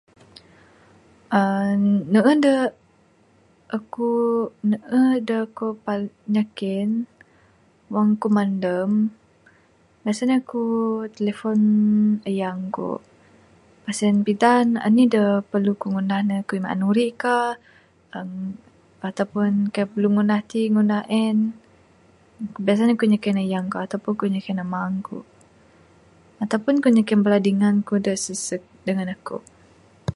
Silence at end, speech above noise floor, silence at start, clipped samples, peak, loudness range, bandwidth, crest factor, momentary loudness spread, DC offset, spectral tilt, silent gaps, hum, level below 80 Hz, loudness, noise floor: 0 s; 37 dB; 1.3 s; under 0.1%; -2 dBFS; 4 LU; 11.5 kHz; 20 dB; 13 LU; under 0.1%; -6.5 dB/octave; none; none; -62 dBFS; -21 LUFS; -58 dBFS